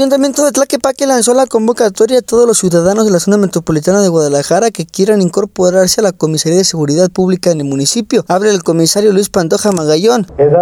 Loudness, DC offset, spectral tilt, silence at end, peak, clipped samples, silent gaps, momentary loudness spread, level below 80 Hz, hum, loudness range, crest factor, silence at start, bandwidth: -11 LUFS; under 0.1%; -4.5 dB/octave; 0 s; 0 dBFS; under 0.1%; none; 4 LU; -46 dBFS; none; 1 LU; 10 dB; 0 s; 17 kHz